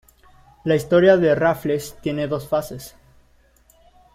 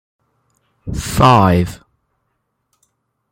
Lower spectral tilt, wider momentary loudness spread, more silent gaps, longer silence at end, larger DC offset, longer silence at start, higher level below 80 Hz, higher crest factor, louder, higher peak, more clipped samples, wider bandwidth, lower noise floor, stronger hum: about the same, -6.5 dB/octave vs -6 dB/octave; about the same, 18 LU vs 18 LU; neither; second, 1.25 s vs 1.55 s; neither; second, 0.65 s vs 0.85 s; second, -52 dBFS vs -36 dBFS; about the same, 18 dB vs 18 dB; second, -19 LUFS vs -14 LUFS; about the same, -2 dBFS vs 0 dBFS; neither; about the same, 16 kHz vs 16.5 kHz; second, -56 dBFS vs -70 dBFS; neither